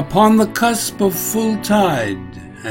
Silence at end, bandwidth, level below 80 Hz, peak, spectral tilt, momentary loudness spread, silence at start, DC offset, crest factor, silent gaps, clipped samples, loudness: 0 s; 16.5 kHz; -44 dBFS; 0 dBFS; -4.5 dB/octave; 15 LU; 0 s; under 0.1%; 16 dB; none; under 0.1%; -16 LUFS